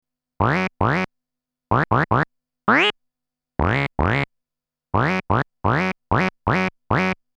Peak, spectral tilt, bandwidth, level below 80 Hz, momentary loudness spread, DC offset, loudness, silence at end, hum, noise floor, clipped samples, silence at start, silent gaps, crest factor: -4 dBFS; -7 dB/octave; 9.4 kHz; -38 dBFS; 6 LU; under 0.1%; -21 LUFS; 0.25 s; none; -87 dBFS; under 0.1%; 0.4 s; none; 18 dB